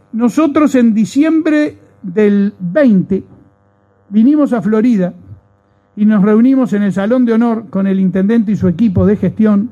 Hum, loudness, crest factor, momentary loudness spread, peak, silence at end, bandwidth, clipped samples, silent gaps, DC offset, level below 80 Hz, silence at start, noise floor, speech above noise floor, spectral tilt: none; -12 LUFS; 12 dB; 6 LU; 0 dBFS; 0.05 s; 8.8 kHz; under 0.1%; none; under 0.1%; -46 dBFS; 0.15 s; -53 dBFS; 42 dB; -8.5 dB/octave